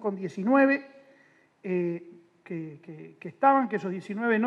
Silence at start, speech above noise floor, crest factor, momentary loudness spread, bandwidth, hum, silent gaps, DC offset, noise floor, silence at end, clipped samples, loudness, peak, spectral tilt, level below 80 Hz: 0 s; 35 dB; 18 dB; 20 LU; 7.4 kHz; none; none; under 0.1%; -61 dBFS; 0 s; under 0.1%; -27 LUFS; -10 dBFS; -8 dB/octave; -84 dBFS